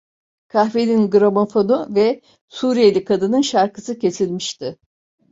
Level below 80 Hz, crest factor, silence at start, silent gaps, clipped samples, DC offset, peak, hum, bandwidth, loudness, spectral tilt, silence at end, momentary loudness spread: -60 dBFS; 16 dB; 0.55 s; 2.41-2.48 s; under 0.1%; under 0.1%; -2 dBFS; none; 7.8 kHz; -17 LUFS; -5.5 dB/octave; 0.55 s; 11 LU